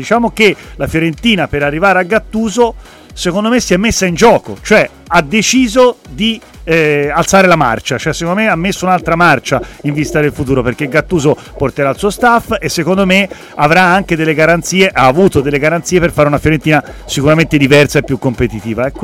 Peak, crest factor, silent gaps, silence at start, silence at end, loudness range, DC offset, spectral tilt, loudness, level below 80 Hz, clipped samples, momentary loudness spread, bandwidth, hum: 0 dBFS; 12 dB; none; 0 s; 0 s; 3 LU; under 0.1%; -5 dB/octave; -11 LUFS; -32 dBFS; under 0.1%; 8 LU; 17 kHz; none